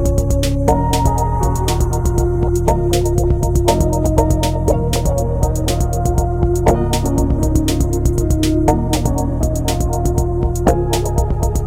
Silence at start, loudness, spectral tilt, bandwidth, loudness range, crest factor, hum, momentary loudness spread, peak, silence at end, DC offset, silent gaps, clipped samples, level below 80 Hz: 0 s; -16 LUFS; -6.5 dB/octave; 16.5 kHz; 1 LU; 14 dB; none; 3 LU; 0 dBFS; 0 s; under 0.1%; none; under 0.1%; -18 dBFS